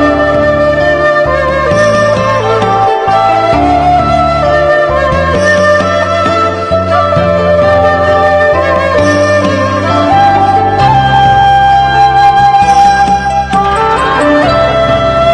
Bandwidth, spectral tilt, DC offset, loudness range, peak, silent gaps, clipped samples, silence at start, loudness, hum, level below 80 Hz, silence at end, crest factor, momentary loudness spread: 10 kHz; -5.5 dB/octave; under 0.1%; 2 LU; 0 dBFS; none; 0.4%; 0 s; -8 LUFS; none; -26 dBFS; 0 s; 8 dB; 4 LU